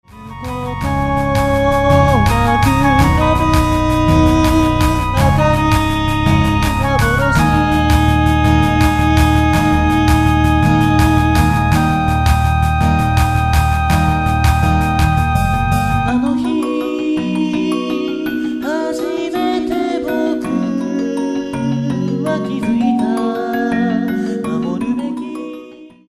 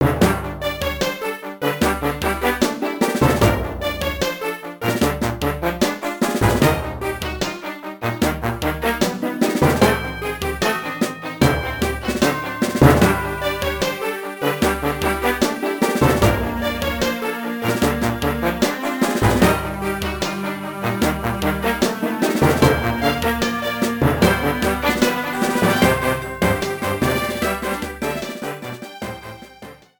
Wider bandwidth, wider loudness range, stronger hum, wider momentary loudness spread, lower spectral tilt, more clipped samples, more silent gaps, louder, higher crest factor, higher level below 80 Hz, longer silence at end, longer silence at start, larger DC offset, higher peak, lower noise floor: second, 15.5 kHz vs 19.5 kHz; first, 6 LU vs 3 LU; neither; about the same, 7 LU vs 9 LU; first, -6.5 dB/octave vs -5 dB/octave; neither; neither; first, -15 LUFS vs -20 LUFS; second, 14 dB vs 20 dB; first, -22 dBFS vs -34 dBFS; about the same, 0.2 s vs 0.25 s; first, 0.15 s vs 0 s; neither; about the same, 0 dBFS vs 0 dBFS; second, -37 dBFS vs -41 dBFS